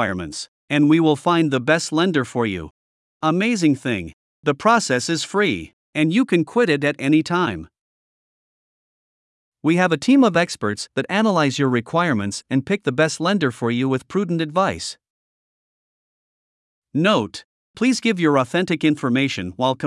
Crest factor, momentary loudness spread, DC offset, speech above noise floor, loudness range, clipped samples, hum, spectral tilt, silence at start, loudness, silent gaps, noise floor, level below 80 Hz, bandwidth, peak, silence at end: 18 dB; 9 LU; under 0.1%; over 71 dB; 5 LU; under 0.1%; none; -5.5 dB/octave; 0 s; -19 LUFS; 0.48-0.68 s, 2.71-3.20 s, 4.13-4.43 s, 5.73-5.93 s, 7.81-9.52 s, 15.10-16.82 s, 17.44-17.74 s; under -90 dBFS; -60 dBFS; 12 kHz; -2 dBFS; 0 s